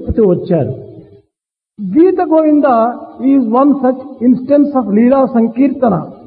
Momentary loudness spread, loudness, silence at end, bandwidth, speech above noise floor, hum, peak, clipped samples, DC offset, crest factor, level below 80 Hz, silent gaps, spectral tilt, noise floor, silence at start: 6 LU; -12 LUFS; 0.1 s; 4.6 kHz; 67 dB; none; 0 dBFS; under 0.1%; under 0.1%; 10 dB; -38 dBFS; none; -13 dB/octave; -78 dBFS; 0 s